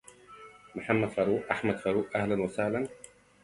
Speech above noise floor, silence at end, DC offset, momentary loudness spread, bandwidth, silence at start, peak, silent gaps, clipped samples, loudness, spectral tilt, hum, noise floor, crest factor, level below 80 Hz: 22 dB; 0.45 s; under 0.1%; 21 LU; 11.5 kHz; 0.3 s; -10 dBFS; none; under 0.1%; -30 LUFS; -6.5 dB/octave; 50 Hz at -55 dBFS; -52 dBFS; 22 dB; -62 dBFS